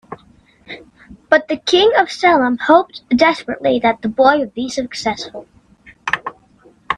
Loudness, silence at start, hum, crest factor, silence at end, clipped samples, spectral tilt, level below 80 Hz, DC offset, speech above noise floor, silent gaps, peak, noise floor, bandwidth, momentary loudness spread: -15 LUFS; 0.1 s; none; 16 dB; 0 s; under 0.1%; -4 dB/octave; -52 dBFS; under 0.1%; 35 dB; none; 0 dBFS; -50 dBFS; 11 kHz; 22 LU